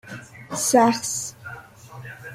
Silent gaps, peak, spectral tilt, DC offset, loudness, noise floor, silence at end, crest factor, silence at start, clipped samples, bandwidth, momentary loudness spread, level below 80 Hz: none; -4 dBFS; -3 dB/octave; under 0.1%; -21 LUFS; -42 dBFS; 0 s; 20 dB; 0.05 s; under 0.1%; 16 kHz; 23 LU; -62 dBFS